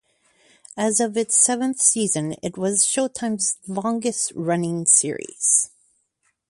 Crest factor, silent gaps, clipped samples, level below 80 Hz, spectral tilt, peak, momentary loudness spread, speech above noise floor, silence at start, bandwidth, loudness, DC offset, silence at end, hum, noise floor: 20 dB; none; under 0.1%; -66 dBFS; -3 dB/octave; -2 dBFS; 10 LU; 48 dB; 0.75 s; 11.5 kHz; -20 LUFS; under 0.1%; 0.8 s; none; -70 dBFS